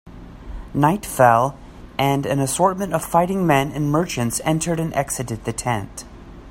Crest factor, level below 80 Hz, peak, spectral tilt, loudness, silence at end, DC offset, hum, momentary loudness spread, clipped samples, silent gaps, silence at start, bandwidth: 20 dB; -42 dBFS; -2 dBFS; -5 dB/octave; -20 LUFS; 0 s; under 0.1%; none; 16 LU; under 0.1%; none; 0.05 s; 16.5 kHz